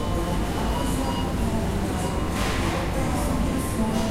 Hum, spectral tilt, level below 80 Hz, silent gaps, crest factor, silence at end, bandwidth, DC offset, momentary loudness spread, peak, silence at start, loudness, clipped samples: none; -5.5 dB/octave; -30 dBFS; none; 14 dB; 0 s; 16 kHz; under 0.1%; 2 LU; -12 dBFS; 0 s; -26 LUFS; under 0.1%